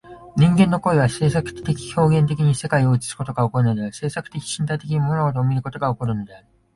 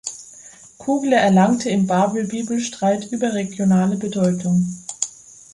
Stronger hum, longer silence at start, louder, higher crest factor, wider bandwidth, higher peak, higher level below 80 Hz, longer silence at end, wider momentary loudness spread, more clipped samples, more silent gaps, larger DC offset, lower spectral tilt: neither; about the same, 0.05 s vs 0.05 s; about the same, -20 LUFS vs -19 LUFS; about the same, 16 dB vs 16 dB; about the same, 11.5 kHz vs 11.5 kHz; about the same, -4 dBFS vs -2 dBFS; first, -46 dBFS vs -60 dBFS; about the same, 0.4 s vs 0.45 s; about the same, 10 LU vs 12 LU; neither; neither; neither; about the same, -6.5 dB/octave vs -5.5 dB/octave